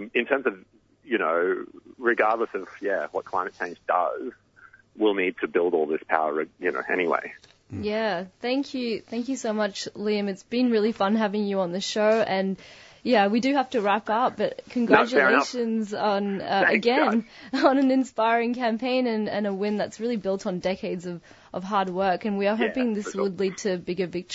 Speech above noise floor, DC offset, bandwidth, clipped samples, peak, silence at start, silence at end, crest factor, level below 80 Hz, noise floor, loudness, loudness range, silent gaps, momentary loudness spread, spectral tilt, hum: 29 dB; under 0.1%; 8 kHz; under 0.1%; -4 dBFS; 0 s; 0 s; 20 dB; -66 dBFS; -54 dBFS; -25 LUFS; 5 LU; none; 10 LU; -5 dB/octave; none